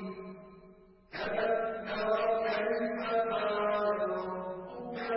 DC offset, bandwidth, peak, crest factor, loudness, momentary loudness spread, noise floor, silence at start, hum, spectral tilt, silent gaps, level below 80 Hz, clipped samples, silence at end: under 0.1%; 5.8 kHz; -18 dBFS; 14 dB; -33 LUFS; 12 LU; -57 dBFS; 0 s; none; -3 dB/octave; none; -66 dBFS; under 0.1%; 0 s